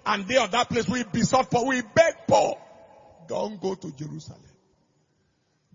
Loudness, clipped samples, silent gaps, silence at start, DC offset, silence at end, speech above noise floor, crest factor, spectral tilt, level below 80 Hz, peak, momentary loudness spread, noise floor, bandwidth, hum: -24 LUFS; under 0.1%; none; 0.05 s; under 0.1%; 1.4 s; 45 dB; 20 dB; -4.5 dB/octave; -58 dBFS; -6 dBFS; 16 LU; -70 dBFS; 7.6 kHz; none